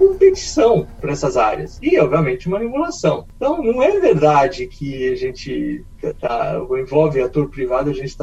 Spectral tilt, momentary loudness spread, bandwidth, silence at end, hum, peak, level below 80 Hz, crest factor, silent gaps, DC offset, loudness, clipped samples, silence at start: -6.5 dB/octave; 10 LU; 8.2 kHz; 0 s; none; -2 dBFS; -38 dBFS; 16 dB; none; under 0.1%; -18 LUFS; under 0.1%; 0 s